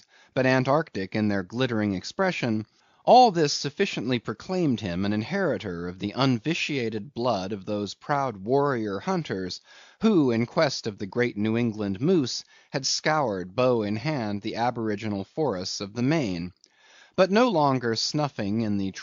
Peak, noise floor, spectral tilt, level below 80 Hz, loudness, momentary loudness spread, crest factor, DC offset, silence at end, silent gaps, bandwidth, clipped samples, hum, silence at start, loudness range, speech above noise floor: -6 dBFS; -56 dBFS; -4.5 dB/octave; -64 dBFS; -26 LUFS; 10 LU; 20 dB; under 0.1%; 0 s; none; 7.4 kHz; under 0.1%; none; 0.35 s; 4 LU; 31 dB